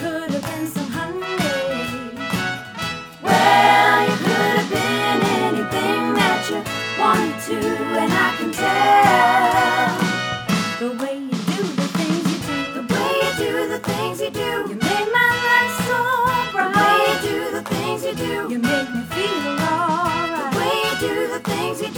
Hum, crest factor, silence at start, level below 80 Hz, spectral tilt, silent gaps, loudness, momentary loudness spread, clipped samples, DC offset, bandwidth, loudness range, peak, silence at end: none; 18 dB; 0 s; -52 dBFS; -4 dB/octave; none; -19 LUFS; 10 LU; under 0.1%; under 0.1%; over 20 kHz; 5 LU; 0 dBFS; 0 s